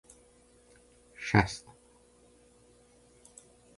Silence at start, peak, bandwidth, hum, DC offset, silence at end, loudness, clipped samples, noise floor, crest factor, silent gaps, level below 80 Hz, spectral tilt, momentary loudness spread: 1.2 s; -8 dBFS; 11.5 kHz; none; under 0.1%; 2.2 s; -30 LUFS; under 0.1%; -62 dBFS; 30 dB; none; -54 dBFS; -5.5 dB/octave; 28 LU